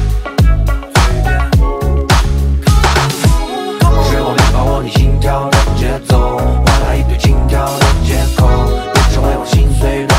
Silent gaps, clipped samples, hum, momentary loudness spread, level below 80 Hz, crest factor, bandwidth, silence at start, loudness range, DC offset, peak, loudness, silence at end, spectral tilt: none; under 0.1%; none; 3 LU; -14 dBFS; 10 dB; 16 kHz; 0 s; 1 LU; under 0.1%; 0 dBFS; -12 LUFS; 0 s; -5.5 dB/octave